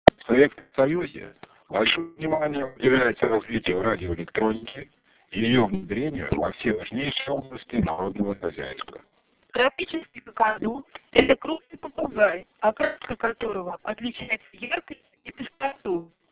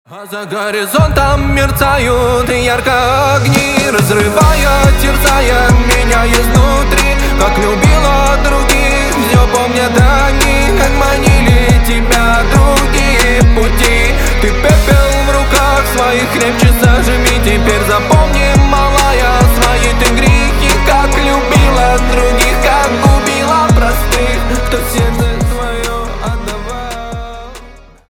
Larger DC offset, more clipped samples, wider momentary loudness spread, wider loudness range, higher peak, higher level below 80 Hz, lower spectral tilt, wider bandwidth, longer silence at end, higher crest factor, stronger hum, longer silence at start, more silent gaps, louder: neither; neither; first, 14 LU vs 6 LU; first, 5 LU vs 2 LU; about the same, 0 dBFS vs 0 dBFS; second, -50 dBFS vs -14 dBFS; first, -9.5 dB/octave vs -4.5 dB/octave; second, 4 kHz vs 19 kHz; about the same, 0.25 s vs 0.3 s; first, 26 dB vs 10 dB; neither; first, 0.25 s vs 0.1 s; neither; second, -25 LUFS vs -10 LUFS